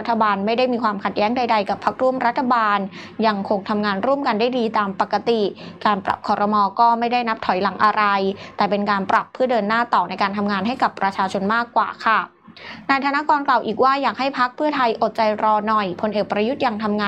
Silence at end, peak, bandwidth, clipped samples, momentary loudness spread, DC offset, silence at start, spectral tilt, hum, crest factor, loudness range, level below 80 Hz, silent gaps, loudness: 0 s; -4 dBFS; 9 kHz; under 0.1%; 4 LU; under 0.1%; 0 s; -6 dB/octave; none; 16 dB; 2 LU; -64 dBFS; none; -20 LUFS